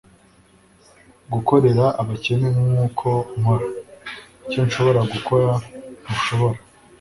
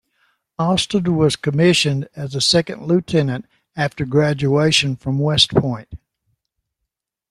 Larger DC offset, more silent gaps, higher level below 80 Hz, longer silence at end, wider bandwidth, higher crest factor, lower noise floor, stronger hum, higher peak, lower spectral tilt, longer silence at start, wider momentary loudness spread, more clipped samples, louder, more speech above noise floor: neither; neither; about the same, -50 dBFS vs -48 dBFS; second, 0.45 s vs 1.35 s; about the same, 11.5 kHz vs 12.5 kHz; about the same, 18 dB vs 18 dB; second, -53 dBFS vs -80 dBFS; neither; about the same, -2 dBFS vs 0 dBFS; first, -7 dB/octave vs -5 dB/octave; first, 1.3 s vs 0.6 s; first, 18 LU vs 11 LU; neither; second, -20 LUFS vs -17 LUFS; second, 35 dB vs 62 dB